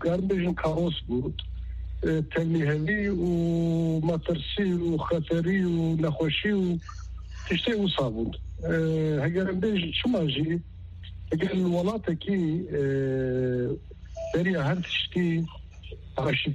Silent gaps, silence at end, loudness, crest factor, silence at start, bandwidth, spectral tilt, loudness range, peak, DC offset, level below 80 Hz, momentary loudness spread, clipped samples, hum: none; 0 s; -27 LUFS; 12 dB; 0 s; 8 kHz; -7.5 dB/octave; 2 LU; -14 dBFS; under 0.1%; -44 dBFS; 12 LU; under 0.1%; none